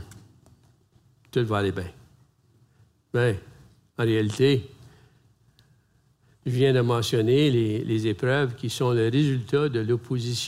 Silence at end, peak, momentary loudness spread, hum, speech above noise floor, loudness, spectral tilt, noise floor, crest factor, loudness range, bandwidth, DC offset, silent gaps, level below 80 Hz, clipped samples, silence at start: 0 s; -10 dBFS; 9 LU; none; 40 dB; -24 LUFS; -6.5 dB/octave; -63 dBFS; 16 dB; 7 LU; 15 kHz; under 0.1%; none; -62 dBFS; under 0.1%; 0 s